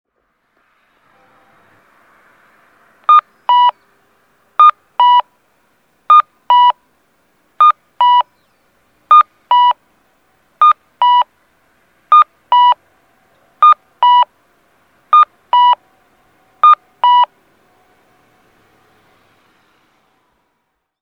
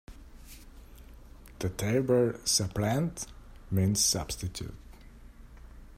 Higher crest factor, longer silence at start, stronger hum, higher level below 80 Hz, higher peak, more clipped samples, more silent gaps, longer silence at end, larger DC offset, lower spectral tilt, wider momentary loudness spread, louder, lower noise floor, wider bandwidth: second, 14 dB vs 20 dB; first, 3.1 s vs 0.1 s; neither; second, -74 dBFS vs -50 dBFS; first, 0 dBFS vs -12 dBFS; neither; neither; first, 3.75 s vs 0 s; neither; second, -0.5 dB/octave vs -4 dB/octave; second, 6 LU vs 21 LU; first, -11 LUFS vs -29 LUFS; first, -69 dBFS vs -50 dBFS; second, 6 kHz vs 16 kHz